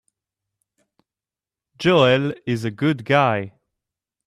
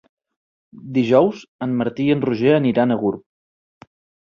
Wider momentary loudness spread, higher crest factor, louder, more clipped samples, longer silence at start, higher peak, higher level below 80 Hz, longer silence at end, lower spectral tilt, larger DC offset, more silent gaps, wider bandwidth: about the same, 10 LU vs 9 LU; about the same, 18 dB vs 18 dB; about the same, -19 LUFS vs -19 LUFS; neither; first, 1.8 s vs 0.75 s; about the same, -4 dBFS vs -2 dBFS; about the same, -60 dBFS vs -60 dBFS; second, 0.8 s vs 1.05 s; second, -6.5 dB/octave vs -8.5 dB/octave; neither; second, none vs 1.48-1.59 s; first, 13.5 kHz vs 7 kHz